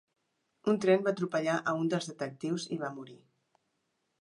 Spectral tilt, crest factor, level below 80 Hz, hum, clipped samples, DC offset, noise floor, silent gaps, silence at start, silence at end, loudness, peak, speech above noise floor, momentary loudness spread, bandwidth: -5.5 dB/octave; 20 dB; -80 dBFS; none; under 0.1%; under 0.1%; -80 dBFS; none; 0.65 s; 1.05 s; -32 LUFS; -12 dBFS; 49 dB; 12 LU; 11 kHz